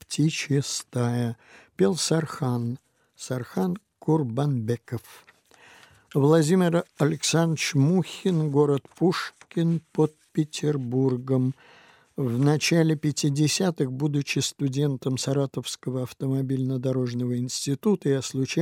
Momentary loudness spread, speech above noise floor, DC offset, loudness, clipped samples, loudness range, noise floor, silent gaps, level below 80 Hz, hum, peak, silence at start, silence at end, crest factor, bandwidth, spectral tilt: 9 LU; 29 dB; under 0.1%; -25 LUFS; under 0.1%; 4 LU; -54 dBFS; none; -68 dBFS; none; -6 dBFS; 0.1 s; 0 s; 18 dB; 16 kHz; -5.5 dB/octave